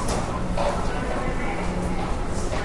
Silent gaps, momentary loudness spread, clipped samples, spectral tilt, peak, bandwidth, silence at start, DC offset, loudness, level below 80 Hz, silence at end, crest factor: none; 3 LU; under 0.1%; -5.5 dB/octave; -10 dBFS; 11.5 kHz; 0 s; under 0.1%; -27 LUFS; -30 dBFS; 0 s; 14 dB